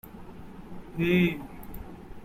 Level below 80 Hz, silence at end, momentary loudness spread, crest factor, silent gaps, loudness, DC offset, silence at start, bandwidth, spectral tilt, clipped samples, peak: -48 dBFS; 0 s; 22 LU; 20 dB; none; -26 LUFS; under 0.1%; 0.05 s; 16 kHz; -7.5 dB/octave; under 0.1%; -12 dBFS